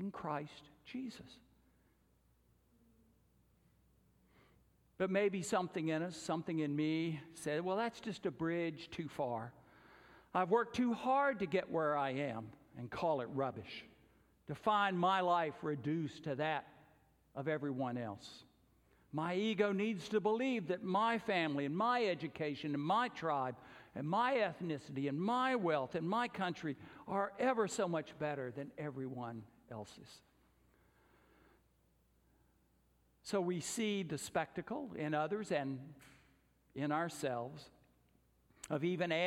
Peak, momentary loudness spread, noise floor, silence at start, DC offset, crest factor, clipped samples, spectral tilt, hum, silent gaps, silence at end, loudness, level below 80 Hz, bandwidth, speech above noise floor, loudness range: -20 dBFS; 15 LU; -74 dBFS; 0 s; under 0.1%; 20 dB; under 0.1%; -5.5 dB/octave; none; none; 0 s; -38 LUFS; -76 dBFS; 16 kHz; 36 dB; 9 LU